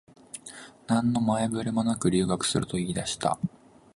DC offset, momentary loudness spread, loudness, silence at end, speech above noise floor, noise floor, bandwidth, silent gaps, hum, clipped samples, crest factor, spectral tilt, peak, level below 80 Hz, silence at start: under 0.1%; 17 LU; -27 LUFS; 0.45 s; 21 dB; -47 dBFS; 11.5 kHz; none; none; under 0.1%; 18 dB; -5 dB/octave; -10 dBFS; -54 dBFS; 0.35 s